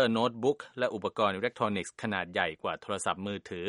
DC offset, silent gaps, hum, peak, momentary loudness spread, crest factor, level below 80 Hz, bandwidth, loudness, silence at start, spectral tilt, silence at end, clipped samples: under 0.1%; none; none; -12 dBFS; 6 LU; 20 dB; -68 dBFS; 11.5 kHz; -32 LUFS; 0 s; -4.5 dB/octave; 0 s; under 0.1%